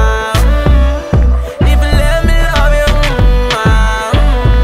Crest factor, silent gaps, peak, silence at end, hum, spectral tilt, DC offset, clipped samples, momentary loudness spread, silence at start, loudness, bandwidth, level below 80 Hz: 8 dB; none; 0 dBFS; 0 s; none; -5.5 dB/octave; under 0.1%; under 0.1%; 2 LU; 0 s; -11 LUFS; 14.5 kHz; -10 dBFS